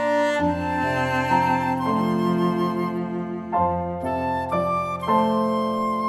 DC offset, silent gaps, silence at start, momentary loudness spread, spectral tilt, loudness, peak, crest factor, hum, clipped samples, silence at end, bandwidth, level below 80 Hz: under 0.1%; none; 0 s; 6 LU; -7 dB/octave; -23 LUFS; -8 dBFS; 14 dB; none; under 0.1%; 0 s; 14 kHz; -50 dBFS